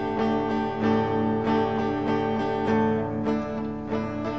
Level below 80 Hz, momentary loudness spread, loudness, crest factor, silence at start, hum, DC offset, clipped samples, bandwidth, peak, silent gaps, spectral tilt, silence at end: -50 dBFS; 6 LU; -26 LUFS; 14 dB; 0 s; 50 Hz at -50 dBFS; 0.3%; under 0.1%; 7.4 kHz; -12 dBFS; none; -8 dB/octave; 0 s